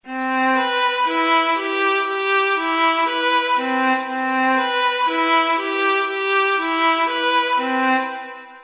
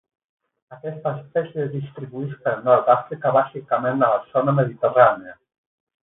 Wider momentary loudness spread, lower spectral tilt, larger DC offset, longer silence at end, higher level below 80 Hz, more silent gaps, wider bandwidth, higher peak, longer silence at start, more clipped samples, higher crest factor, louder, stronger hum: second, 3 LU vs 15 LU; second, -5 dB/octave vs -12 dB/octave; neither; second, 0 s vs 0.7 s; second, -72 dBFS vs -66 dBFS; neither; about the same, 4 kHz vs 4 kHz; second, -6 dBFS vs -2 dBFS; second, 0.05 s vs 0.7 s; neither; second, 12 dB vs 20 dB; first, -18 LUFS vs -21 LUFS; neither